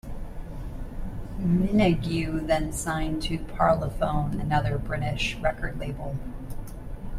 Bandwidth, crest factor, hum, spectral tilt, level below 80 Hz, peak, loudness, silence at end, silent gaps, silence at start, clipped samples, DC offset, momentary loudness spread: 15 kHz; 20 dB; none; -6 dB/octave; -36 dBFS; -8 dBFS; -27 LUFS; 0 s; none; 0.05 s; under 0.1%; under 0.1%; 17 LU